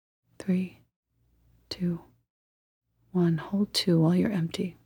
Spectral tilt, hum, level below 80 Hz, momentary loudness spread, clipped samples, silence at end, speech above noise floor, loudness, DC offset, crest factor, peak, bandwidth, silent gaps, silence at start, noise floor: -6.5 dB/octave; none; -64 dBFS; 15 LU; under 0.1%; 0.15 s; 40 dB; -27 LUFS; under 0.1%; 18 dB; -12 dBFS; 17 kHz; 0.96-1.03 s, 2.30-2.81 s; 0.4 s; -67 dBFS